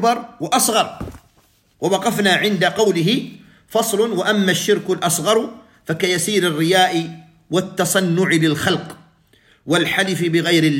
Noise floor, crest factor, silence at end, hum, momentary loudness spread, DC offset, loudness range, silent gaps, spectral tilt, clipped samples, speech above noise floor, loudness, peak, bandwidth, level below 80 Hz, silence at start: -57 dBFS; 16 dB; 0 s; none; 9 LU; under 0.1%; 2 LU; none; -4 dB/octave; under 0.1%; 40 dB; -17 LUFS; -2 dBFS; 16.5 kHz; -54 dBFS; 0 s